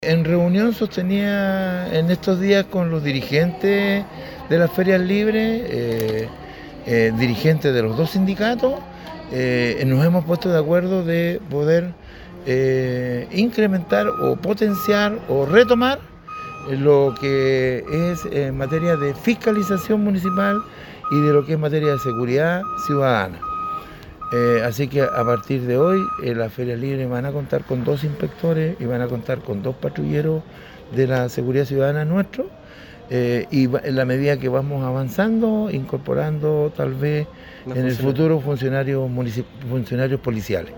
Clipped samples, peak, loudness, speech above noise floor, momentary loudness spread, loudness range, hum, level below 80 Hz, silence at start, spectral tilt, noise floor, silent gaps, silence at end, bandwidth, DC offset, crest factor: under 0.1%; 0 dBFS; -20 LUFS; 22 dB; 9 LU; 4 LU; none; -48 dBFS; 0 s; -7.5 dB/octave; -41 dBFS; none; 0 s; 17.5 kHz; under 0.1%; 20 dB